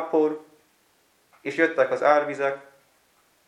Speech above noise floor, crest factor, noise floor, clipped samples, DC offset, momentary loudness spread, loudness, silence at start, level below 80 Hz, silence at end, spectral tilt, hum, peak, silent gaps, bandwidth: 41 dB; 20 dB; -64 dBFS; under 0.1%; under 0.1%; 16 LU; -23 LUFS; 0 s; -84 dBFS; 0.85 s; -5.5 dB/octave; none; -6 dBFS; none; 11.5 kHz